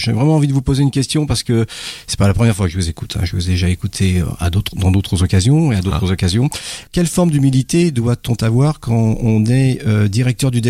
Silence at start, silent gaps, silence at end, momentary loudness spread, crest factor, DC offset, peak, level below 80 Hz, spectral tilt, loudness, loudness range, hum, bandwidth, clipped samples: 0 s; none; 0 s; 6 LU; 14 dB; under 0.1%; -2 dBFS; -32 dBFS; -6 dB/octave; -16 LUFS; 2 LU; none; 15.5 kHz; under 0.1%